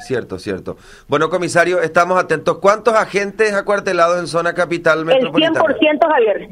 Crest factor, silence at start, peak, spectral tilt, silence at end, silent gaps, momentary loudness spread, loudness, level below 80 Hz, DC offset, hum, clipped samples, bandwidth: 16 dB; 0 s; 0 dBFS; -4.5 dB/octave; 0.05 s; none; 9 LU; -15 LUFS; -52 dBFS; under 0.1%; none; under 0.1%; 13 kHz